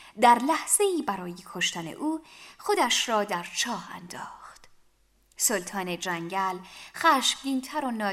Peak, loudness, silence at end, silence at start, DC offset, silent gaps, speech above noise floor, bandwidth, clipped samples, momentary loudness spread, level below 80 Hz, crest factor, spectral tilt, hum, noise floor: -6 dBFS; -26 LUFS; 0 s; 0 s; under 0.1%; none; 37 dB; 16 kHz; under 0.1%; 17 LU; -68 dBFS; 20 dB; -2 dB/octave; none; -64 dBFS